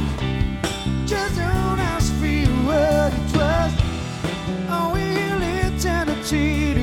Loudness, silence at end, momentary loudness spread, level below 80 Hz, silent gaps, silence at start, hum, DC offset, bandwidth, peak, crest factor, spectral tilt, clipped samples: -21 LUFS; 0 s; 6 LU; -28 dBFS; none; 0 s; none; under 0.1%; 16.5 kHz; -4 dBFS; 16 dB; -5.5 dB/octave; under 0.1%